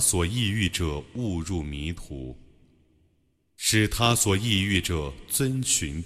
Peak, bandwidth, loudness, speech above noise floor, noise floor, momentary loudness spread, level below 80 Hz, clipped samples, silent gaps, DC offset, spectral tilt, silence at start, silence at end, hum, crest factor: -6 dBFS; 16 kHz; -25 LUFS; 42 dB; -68 dBFS; 12 LU; -42 dBFS; under 0.1%; none; under 0.1%; -3.5 dB/octave; 0 s; 0 s; none; 20 dB